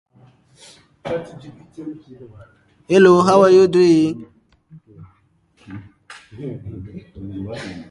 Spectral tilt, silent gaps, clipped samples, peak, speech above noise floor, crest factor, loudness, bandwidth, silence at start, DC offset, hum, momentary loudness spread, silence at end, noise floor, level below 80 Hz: -6.5 dB/octave; none; under 0.1%; 0 dBFS; 42 dB; 18 dB; -14 LUFS; 10.5 kHz; 1.05 s; under 0.1%; none; 27 LU; 0.05 s; -59 dBFS; -52 dBFS